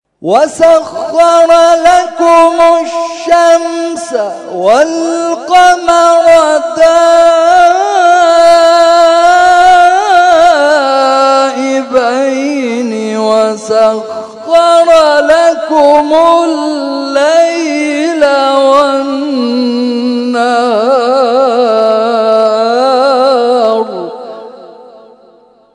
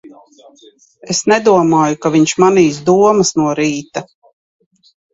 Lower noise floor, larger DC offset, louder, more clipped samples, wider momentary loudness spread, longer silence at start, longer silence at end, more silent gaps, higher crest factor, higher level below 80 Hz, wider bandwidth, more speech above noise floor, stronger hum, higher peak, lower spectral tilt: about the same, -43 dBFS vs -40 dBFS; neither; first, -8 LUFS vs -12 LUFS; first, 4% vs under 0.1%; about the same, 9 LU vs 9 LU; first, 0.2 s vs 0.05 s; second, 0.9 s vs 1.1 s; neither; second, 8 dB vs 14 dB; first, -48 dBFS vs -54 dBFS; first, 12 kHz vs 8.2 kHz; first, 36 dB vs 28 dB; neither; about the same, 0 dBFS vs 0 dBFS; second, -3 dB/octave vs -4.5 dB/octave